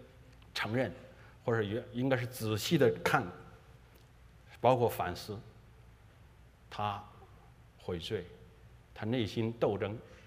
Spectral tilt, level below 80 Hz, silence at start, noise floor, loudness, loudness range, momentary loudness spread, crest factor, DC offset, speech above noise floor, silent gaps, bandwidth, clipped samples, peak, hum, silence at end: -6 dB/octave; -62 dBFS; 0 s; -59 dBFS; -34 LUFS; 10 LU; 19 LU; 26 dB; under 0.1%; 26 dB; none; 15.5 kHz; under 0.1%; -10 dBFS; none; 0 s